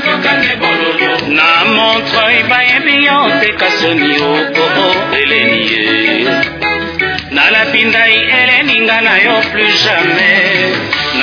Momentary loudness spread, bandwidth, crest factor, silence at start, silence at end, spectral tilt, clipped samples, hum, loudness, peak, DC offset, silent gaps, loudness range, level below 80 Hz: 5 LU; 5.4 kHz; 10 dB; 0 s; 0 s; -4 dB/octave; 0.3%; none; -9 LUFS; 0 dBFS; under 0.1%; none; 3 LU; -44 dBFS